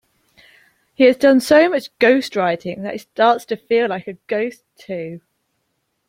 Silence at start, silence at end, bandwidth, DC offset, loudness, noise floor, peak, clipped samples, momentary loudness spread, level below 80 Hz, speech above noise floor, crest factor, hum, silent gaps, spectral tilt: 1 s; 0.9 s; 16.5 kHz; under 0.1%; -17 LUFS; -71 dBFS; 0 dBFS; under 0.1%; 16 LU; -62 dBFS; 54 dB; 18 dB; none; none; -5 dB/octave